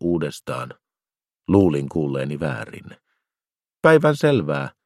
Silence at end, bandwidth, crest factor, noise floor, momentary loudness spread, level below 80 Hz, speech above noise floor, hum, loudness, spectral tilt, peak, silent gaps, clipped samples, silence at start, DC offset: 0.15 s; 14 kHz; 22 dB; under -90 dBFS; 19 LU; -54 dBFS; over 70 dB; none; -20 LUFS; -7 dB/octave; 0 dBFS; none; under 0.1%; 0 s; under 0.1%